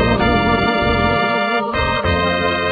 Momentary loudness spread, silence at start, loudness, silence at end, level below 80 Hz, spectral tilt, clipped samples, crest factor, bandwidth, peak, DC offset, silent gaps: 3 LU; 0 s; -16 LUFS; 0 s; -30 dBFS; -8 dB/octave; under 0.1%; 14 dB; 4.9 kHz; -2 dBFS; under 0.1%; none